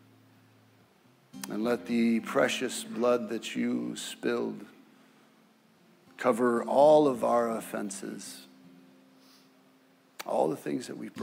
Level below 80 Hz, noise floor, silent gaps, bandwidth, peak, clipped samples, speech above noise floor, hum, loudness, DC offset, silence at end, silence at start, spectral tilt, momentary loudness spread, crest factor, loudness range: -82 dBFS; -63 dBFS; none; 16 kHz; -10 dBFS; under 0.1%; 35 dB; none; -29 LUFS; under 0.1%; 0 s; 1.35 s; -4.5 dB/octave; 17 LU; 20 dB; 9 LU